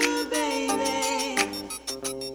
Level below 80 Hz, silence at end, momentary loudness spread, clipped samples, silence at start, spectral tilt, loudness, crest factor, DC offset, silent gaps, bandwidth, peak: -58 dBFS; 0 s; 7 LU; under 0.1%; 0 s; -1.5 dB/octave; -27 LUFS; 20 dB; under 0.1%; none; over 20 kHz; -8 dBFS